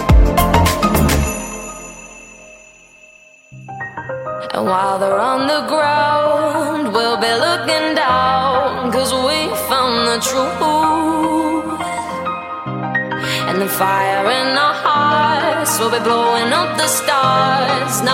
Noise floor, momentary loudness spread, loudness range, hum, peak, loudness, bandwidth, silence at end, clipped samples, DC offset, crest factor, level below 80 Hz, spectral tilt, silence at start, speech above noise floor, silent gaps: -45 dBFS; 11 LU; 7 LU; none; 0 dBFS; -15 LUFS; 16.5 kHz; 0 s; under 0.1%; under 0.1%; 16 dB; -28 dBFS; -4 dB/octave; 0 s; 29 dB; none